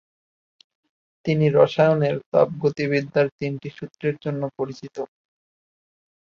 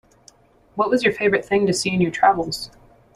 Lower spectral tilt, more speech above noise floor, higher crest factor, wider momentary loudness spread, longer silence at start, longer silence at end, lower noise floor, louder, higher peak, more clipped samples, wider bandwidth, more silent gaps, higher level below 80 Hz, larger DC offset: first, -8 dB/octave vs -4.5 dB/octave; first, over 69 dB vs 34 dB; about the same, 20 dB vs 20 dB; first, 16 LU vs 12 LU; first, 1.25 s vs 0.75 s; first, 1.25 s vs 0.5 s; first, under -90 dBFS vs -53 dBFS; about the same, -22 LUFS vs -20 LUFS; about the same, -4 dBFS vs -2 dBFS; neither; second, 7 kHz vs 13 kHz; first, 2.26-2.32 s, 3.32-3.39 s vs none; second, -62 dBFS vs -54 dBFS; neither